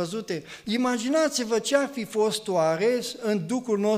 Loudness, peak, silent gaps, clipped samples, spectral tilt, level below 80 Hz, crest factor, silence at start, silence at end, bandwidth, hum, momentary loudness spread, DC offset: -26 LUFS; -8 dBFS; none; under 0.1%; -4 dB/octave; -70 dBFS; 18 dB; 0 s; 0 s; 15.5 kHz; none; 7 LU; under 0.1%